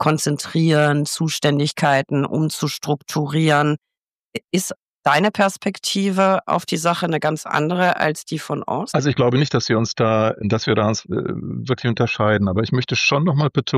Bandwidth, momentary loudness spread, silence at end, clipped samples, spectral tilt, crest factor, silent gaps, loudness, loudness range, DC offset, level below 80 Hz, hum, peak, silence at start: 15.5 kHz; 7 LU; 0 s; under 0.1%; -5 dB/octave; 16 dB; 3.78-3.82 s, 4.03-4.30 s, 4.76-4.94 s; -19 LUFS; 1 LU; under 0.1%; -58 dBFS; none; -4 dBFS; 0 s